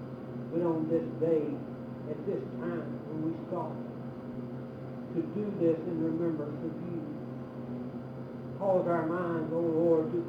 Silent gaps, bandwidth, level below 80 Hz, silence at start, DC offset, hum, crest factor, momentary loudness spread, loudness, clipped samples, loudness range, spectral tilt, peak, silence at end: none; 5.2 kHz; -68 dBFS; 0 s; under 0.1%; none; 16 dB; 13 LU; -34 LUFS; under 0.1%; 4 LU; -10 dB/octave; -16 dBFS; 0 s